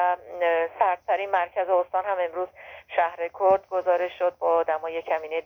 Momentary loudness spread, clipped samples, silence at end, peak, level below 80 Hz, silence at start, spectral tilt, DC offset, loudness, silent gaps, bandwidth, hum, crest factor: 6 LU; under 0.1%; 0.05 s; -8 dBFS; -68 dBFS; 0 s; -5.5 dB/octave; under 0.1%; -25 LUFS; none; 6.2 kHz; none; 16 dB